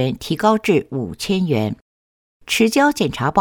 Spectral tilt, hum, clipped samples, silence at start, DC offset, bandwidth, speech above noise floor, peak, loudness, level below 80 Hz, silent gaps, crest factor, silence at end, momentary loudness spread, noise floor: -5 dB/octave; none; under 0.1%; 0 s; under 0.1%; 19 kHz; over 72 dB; -4 dBFS; -18 LUFS; -48 dBFS; 1.81-2.40 s; 16 dB; 0 s; 10 LU; under -90 dBFS